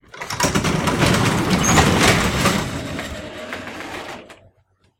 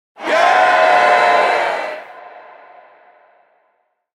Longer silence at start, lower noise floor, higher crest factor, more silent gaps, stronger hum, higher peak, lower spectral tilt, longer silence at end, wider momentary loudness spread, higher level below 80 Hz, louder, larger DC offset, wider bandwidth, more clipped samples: about the same, 0.15 s vs 0.2 s; about the same, -61 dBFS vs -64 dBFS; about the same, 20 dB vs 16 dB; neither; neither; about the same, 0 dBFS vs 0 dBFS; first, -4 dB/octave vs -2 dB/octave; second, 0.65 s vs 1.75 s; about the same, 16 LU vs 16 LU; first, -36 dBFS vs -68 dBFS; second, -17 LUFS vs -13 LUFS; neither; first, 16.5 kHz vs 12 kHz; neither